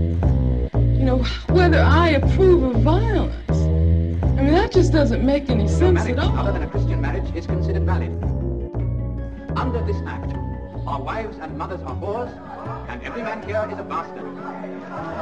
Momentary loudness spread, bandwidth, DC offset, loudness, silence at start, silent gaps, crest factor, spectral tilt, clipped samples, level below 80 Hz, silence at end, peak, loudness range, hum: 15 LU; 8.2 kHz; 0.3%; -21 LUFS; 0 s; none; 16 dB; -8 dB/octave; under 0.1%; -26 dBFS; 0 s; -4 dBFS; 11 LU; none